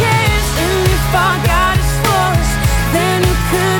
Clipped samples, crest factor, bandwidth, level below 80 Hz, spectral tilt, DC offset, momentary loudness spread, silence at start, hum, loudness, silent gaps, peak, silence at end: under 0.1%; 12 dB; 19 kHz; -20 dBFS; -4.5 dB/octave; under 0.1%; 2 LU; 0 s; none; -13 LUFS; none; 0 dBFS; 0 s